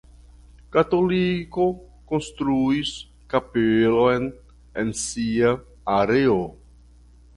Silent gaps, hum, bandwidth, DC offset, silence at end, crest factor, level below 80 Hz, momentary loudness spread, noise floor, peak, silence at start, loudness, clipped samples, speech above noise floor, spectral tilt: none; none; 11.5 kHz; under 0.1%; 0.85 s; 18 dB; -48 dBFS; 10 LU; -50 dBFS; -4 dBFS; 0.7 s; -22 LUFS; under 0.1%; 29 dB; -5.5 dB/octave